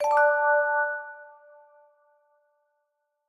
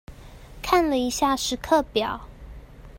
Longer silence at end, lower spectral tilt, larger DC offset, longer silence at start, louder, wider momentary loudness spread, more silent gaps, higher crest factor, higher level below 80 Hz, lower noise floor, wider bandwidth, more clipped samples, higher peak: first, 2.05 s vs 0 s; second, -0.5 dB/octave vs -3.5 dB/octave; neither; about the same, 0 s vs 0.1 s; about the same, -23 LUFS vs -23 LUFS; first, 21 LU vs 14 LU; neither; about the same, 16 dB vs 20 dB; second, -78 dBFS vs -44 dBFS; first, -78 dBFS vs -43 dBFS; second, 11.5 kHz vs 16.5 kHz; neither; second, -12 dBFS vs -6 dBFS